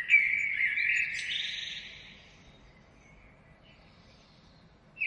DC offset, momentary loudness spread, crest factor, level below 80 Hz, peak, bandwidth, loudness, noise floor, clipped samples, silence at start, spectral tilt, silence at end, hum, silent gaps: under 0.1%; 23 LU; 22 dB; -64 dBFS; -12 dBFS; 11.5 kHz; -28 LUFS; -58 dBFS; under 0.1%; 0 s; 0 dB/octave; 0 s; none; none